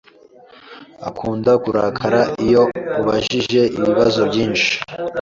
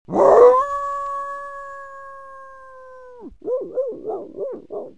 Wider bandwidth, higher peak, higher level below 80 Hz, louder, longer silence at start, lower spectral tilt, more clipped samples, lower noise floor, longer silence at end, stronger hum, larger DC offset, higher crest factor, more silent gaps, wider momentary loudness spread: second, 7.6 kHz vs 9.2 kHz; about the same, -2 dBFS vs 0 dBFS; first, -48 dBFS vs -54 dBFS; about the same, -17 LUFS vs -18 LUFS; first, 0.65 s vs 0.1 s; second, -5 dB/octave vs -6.5 dB/octave; neither; first, -46 dBFS vs -42 dBFS; about the same, 0 s vs 0.1 s; neither; second, under 0.1% vs 0.3%; about the same, 16 dB vs 20 dB; neither; second, 9 LU vs 27 LU